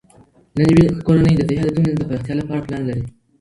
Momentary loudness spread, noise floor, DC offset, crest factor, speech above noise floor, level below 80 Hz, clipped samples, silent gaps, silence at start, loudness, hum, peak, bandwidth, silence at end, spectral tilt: 12 LU; -50 dBFS; under 0.1%; 18 dB; 34 dB; -38 dBFS; under 0.1%; none; 0.55 s; -17 LUFS; none; 0 dBFS; 11 kHz; 0.3 s; -8.5 dB/octave